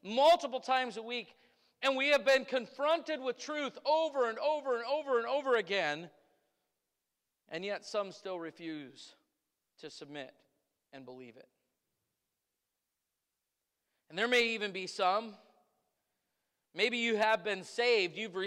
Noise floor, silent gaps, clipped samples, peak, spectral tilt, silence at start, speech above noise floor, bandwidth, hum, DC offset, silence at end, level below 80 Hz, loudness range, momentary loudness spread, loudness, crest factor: -88 dBFS; none; under 0.1%; -18 dBFS; -3 dB/octave; 0.05 s; 54 dB; 16 kHz; none; under 0.1%; 0 s; -82 dBFS; 19 LU; 19 LU; -32 LUFS; 18 dB